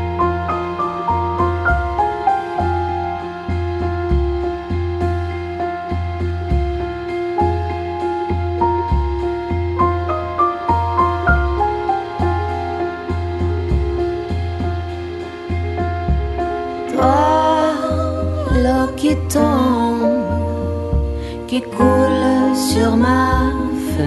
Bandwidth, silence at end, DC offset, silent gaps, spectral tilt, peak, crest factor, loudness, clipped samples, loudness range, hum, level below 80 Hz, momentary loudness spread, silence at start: 12 kHz; 0 s; under 0.1%; none; -7 dB/octave; 0 dBFS; 18 dB; -18 LUFS; under 0.1%; 5 LU; none; -26 dBFS; 8 LU; 0 s